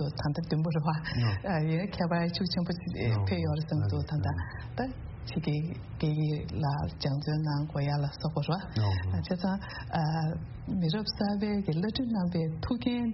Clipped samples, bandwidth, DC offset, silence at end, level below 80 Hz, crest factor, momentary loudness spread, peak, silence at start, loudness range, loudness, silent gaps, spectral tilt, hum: under 0.1%; 6 kHz; under 0.1%; 0 s; -48 dBFS; 16 dB; 5 LU; -14 dBFS; 0 s; 2 LU; -31 LUFS; none; -6.5 dB/octave; none